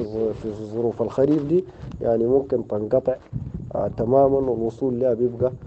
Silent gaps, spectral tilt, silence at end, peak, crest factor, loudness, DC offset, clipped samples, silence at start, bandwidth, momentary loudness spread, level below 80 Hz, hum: none; -10 dB/octave; 0 s; -6 dBFS; 16 dB; -23 LUFS; under 0.1%; under 0.1%; 0 s; 7.8 kHz; 11 LU; -46 dBFS; none